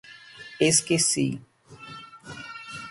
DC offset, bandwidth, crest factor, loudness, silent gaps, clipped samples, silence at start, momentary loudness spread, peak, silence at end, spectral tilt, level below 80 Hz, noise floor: under 0.1%; 12 kHz; 20 dB; -22 LUFS; none; under 0.1%; 0.05 s; 23 LU; -8 dBFS; 0 s; -3 dB/octave; -64 dBFS; -46 dBFS